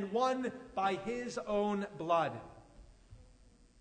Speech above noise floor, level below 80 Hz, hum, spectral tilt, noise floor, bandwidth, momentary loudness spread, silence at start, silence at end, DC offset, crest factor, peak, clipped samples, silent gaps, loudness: 27 dB; -62 dBFS; none; -5.5 dB/octave; -62 dBFS; 9.4 kHz; 7 LU; 0 s; 0.55 s; under 0.1%; 18 dB; -18 dBFS; under 0.1%; none; -35 LUFS